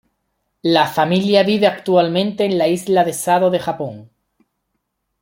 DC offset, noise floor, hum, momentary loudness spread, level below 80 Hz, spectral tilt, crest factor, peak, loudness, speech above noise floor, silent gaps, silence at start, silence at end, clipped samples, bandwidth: under 0.1%; -73 dBFS; none; 8 LU; -60 dBFS; -5 dB/octave; 18 dB; 0 dBFS; -16 LUFS; 57 dB; none; 0.65 s; 1.15 s; under 0.1%; 16.5 kHz